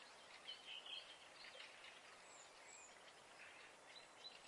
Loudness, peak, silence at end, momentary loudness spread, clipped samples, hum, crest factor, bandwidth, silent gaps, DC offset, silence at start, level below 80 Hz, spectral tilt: -57 LUFS; -42 dBFS; 0 s; 8 LU; under 0.1%; none; 18 dB; 12 kHz; none; under 0.1%; 0 s; under -90 dBFS; 0 dB/octave